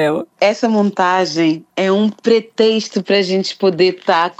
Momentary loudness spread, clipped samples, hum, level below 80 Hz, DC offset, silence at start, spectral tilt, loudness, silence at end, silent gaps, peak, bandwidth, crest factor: 3 LU; under 0.1%; none; -68 dBFS; under 0.1%; 0 s; -5 dB/octave; -15 LUFS; 0.05 s; none; 0 dBFS; 9.6 kHz; 14 dB